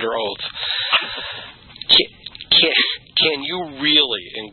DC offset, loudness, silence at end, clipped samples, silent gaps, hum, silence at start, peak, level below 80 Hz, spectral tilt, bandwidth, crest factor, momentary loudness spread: under 0.1%; -16 LUFS; 0 s; under 0.1%; none; none; 0 s; 0 dBFS; -54 dBFS; -4.5 dB/octave; 11 kHz; 20 dB; 14 LU